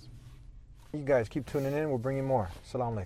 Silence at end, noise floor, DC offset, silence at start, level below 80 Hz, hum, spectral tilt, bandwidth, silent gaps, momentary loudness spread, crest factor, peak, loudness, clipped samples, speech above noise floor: 0 s; -51 dBFS; under 0.1%; 0 s; -52 dBFS; none; -7.5 dB/octave; 16 kHz; none; 13 LU; 18 dB; -16 dBFS; -32 LUFS; under 0.1%; 20 dB